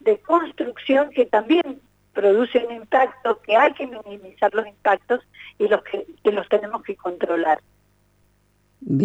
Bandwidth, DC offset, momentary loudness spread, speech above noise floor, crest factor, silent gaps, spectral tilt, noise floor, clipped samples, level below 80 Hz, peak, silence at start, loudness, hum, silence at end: 8 kHz; under 0.1%; 13 LU; 42 dB; 16 dB; none; -7 dB/octave; -62 dBFS; under 0.1%; -66 dBFS; -6 dBFS; 0.05 s; -21 LUFS; 50 Hz at -60 dBFS; 0 s